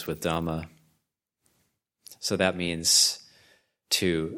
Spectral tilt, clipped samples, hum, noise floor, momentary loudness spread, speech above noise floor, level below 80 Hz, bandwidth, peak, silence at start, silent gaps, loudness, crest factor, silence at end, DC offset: -2.5 dB/octave; under 0.1%; none; -79 dBFS; 16 LU; 53 dB; -56 dBFS; 17 kHz; -8 dBFS; 0 s; none; -25 LUFS; 22 dB; 0 s; under 0.1%